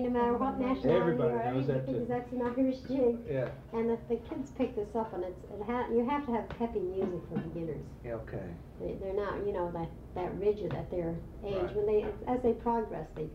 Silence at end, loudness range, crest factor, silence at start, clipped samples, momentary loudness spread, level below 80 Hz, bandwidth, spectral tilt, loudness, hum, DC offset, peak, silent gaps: 0 s; 6 LU; 18 dB; 0 s; under 0.1%; 10 LU; -52 dBFS; 7.8 kHz; -9 dB/octave; -33 LUFS; none; under 0.1%; -16 dBFS; none